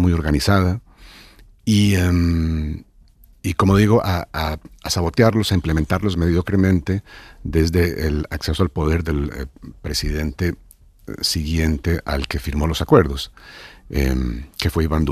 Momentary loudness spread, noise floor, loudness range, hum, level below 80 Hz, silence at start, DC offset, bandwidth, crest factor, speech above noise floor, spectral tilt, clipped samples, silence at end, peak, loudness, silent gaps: 13 LU; -49 dBFS; 4 LU; none; -28 dBFS; 0 s; under 0.1%; 15 kHz; 18 dB; 31 dB; -6 dB/octave; under 0.1%; 0 s; -2 dBFS; -20 LUFS; none